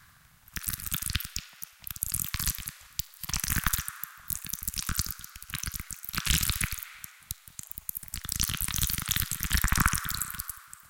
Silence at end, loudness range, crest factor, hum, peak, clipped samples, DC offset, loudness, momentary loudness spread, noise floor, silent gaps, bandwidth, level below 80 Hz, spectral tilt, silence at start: 0 s; 3 LU; 26 dB; none; -6 dBFS; under 0.1%; under 0.1%; -31 LUFS; 14 LU; -58 dBFS; none; 17.5 kHz; -40 dBFS; -1.5 dB/octave; 0 s